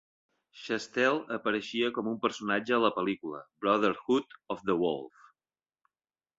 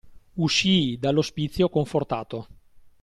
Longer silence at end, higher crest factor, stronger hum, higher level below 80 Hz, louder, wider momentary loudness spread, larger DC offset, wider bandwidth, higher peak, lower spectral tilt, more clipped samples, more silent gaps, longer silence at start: first, 1.3 s vs 0.25 s; about the same, 20 dB vs 16 dB; neither; second, -72 dBFS vs -50 dBFS; second, -30 LUFS vs -24 LUFS; second, 11 LU vs 15 LU; neither; second, 8 kHz vs 12.5 kHz; second, -12 dBFS vs -8 dBFS; about the same, -5 dB/octave vs -5 dB/octave; neither; neither; first, 0.55 s vs 0.05 s